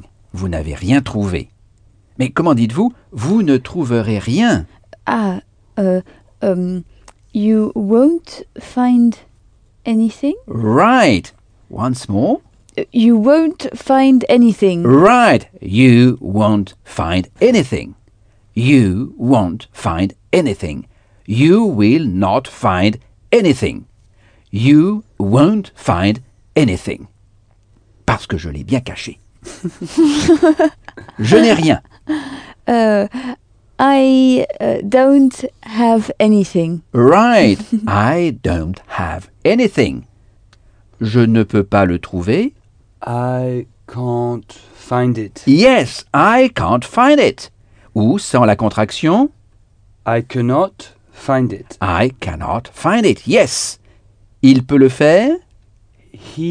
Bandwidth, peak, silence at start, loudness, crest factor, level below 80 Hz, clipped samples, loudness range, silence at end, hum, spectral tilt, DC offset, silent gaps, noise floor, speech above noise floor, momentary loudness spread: 10 kHz; 0 dBFS; 0.35 s; -14 LUFS; 14 dB; -40 dBFS; under 0.1%; 6 LU; 0 s; none; -6.5 dB/octave; under 0.1%; none; -51 dBFS; 38 dB; 14 LU